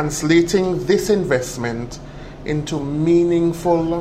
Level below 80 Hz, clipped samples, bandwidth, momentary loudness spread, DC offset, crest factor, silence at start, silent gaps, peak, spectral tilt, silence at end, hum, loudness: -40 dBFS; under 0.1%; 15.5 kHz; 15 LU; under 0.1%; 14 dB; 0 s; none; -4 dBFS; -5.5 dB/octave; 0 s; none; -18 LUFS